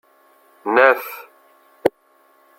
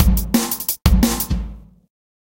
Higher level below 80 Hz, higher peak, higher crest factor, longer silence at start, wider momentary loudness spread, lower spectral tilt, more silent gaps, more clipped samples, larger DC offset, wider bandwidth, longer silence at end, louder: second, -68 dBFS vs -22 dBFS; about the same, -2 dBFS vs 0 dBFS; about the same, 20 dB vs 18 dB; first, 0.65 s vs 0 s; first, 19 LU vs 9 LU; about the same, -4.5 dB/octave vs -5 dB/octave; neither; neither; neither; about the same, 16.5 kHz vs 17.5 kHz; about the same, 0.7 s vs 0.6 s; about the same, -18 LUFS vs -19 LUFS